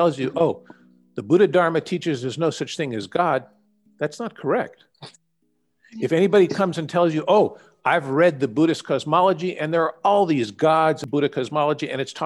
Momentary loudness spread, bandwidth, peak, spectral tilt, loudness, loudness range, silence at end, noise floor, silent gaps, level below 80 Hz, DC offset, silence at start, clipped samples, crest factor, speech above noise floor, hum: 10 LU; 12 kHz; -6 dBFS; -6 dB/octave; -21 LUFS; 6 LU; 0 s; -71 dBFS; none; -68 dBFS; under 0.1%; 0 s; under 0.1%; 16 dB; 50 dB; none